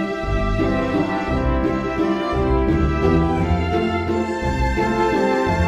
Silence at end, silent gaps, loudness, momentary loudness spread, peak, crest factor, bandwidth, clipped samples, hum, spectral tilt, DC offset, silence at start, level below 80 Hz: 0 s; none; -20 LUFS; 4 LU; -4 dBFS; 14 dB; 11.5 kHz; under 0.1%; none; -7.5 dB/octave; under 0.1%; 0 s; -26 dBFS